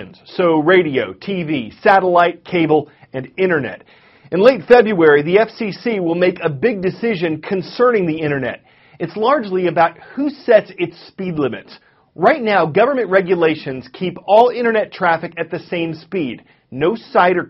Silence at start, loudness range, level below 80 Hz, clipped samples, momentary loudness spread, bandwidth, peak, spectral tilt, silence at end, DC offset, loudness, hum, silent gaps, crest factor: 0 s; 4 LU; -56 dBFS; under 0.1%; 13 LU; 6 kHz; 0 dBFS; -4.5 dB/octave; 0 s; under 0.1%; -16 LUFS; none; none; 16 dB